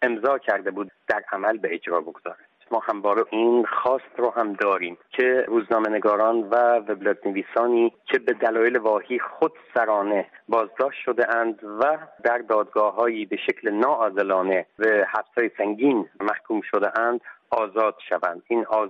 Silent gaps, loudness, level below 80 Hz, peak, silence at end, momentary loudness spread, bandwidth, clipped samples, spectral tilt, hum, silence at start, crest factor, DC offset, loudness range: none; -23 LUFS; -74 dBFS; -6 dBFS; 0 s; 7 LU; 5.8 kHz; under 0.1%; -7 dB/octave; none; 0 s; 18 dB; under 0.1%; 2 LU